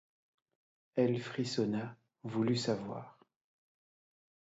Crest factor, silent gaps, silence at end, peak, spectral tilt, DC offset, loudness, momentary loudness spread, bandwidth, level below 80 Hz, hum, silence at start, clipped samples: 20 dB; none; 1.3 s; -16 dBFS; -6 dB/octave; under 0.1%; -35 LUFS; 15 LU; 8 kHz; -76 dBFS; none; 0.95 s; under 0.1%